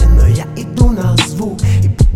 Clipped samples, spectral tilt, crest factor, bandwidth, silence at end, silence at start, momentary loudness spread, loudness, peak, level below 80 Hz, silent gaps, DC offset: under 0.1%; -6 dB/octave; 10 dB; 14 kHz; 0 s; 0 s; 6 LU; -13 LUFS; 0 dBFS; -14 dBFS; none; under 0.1%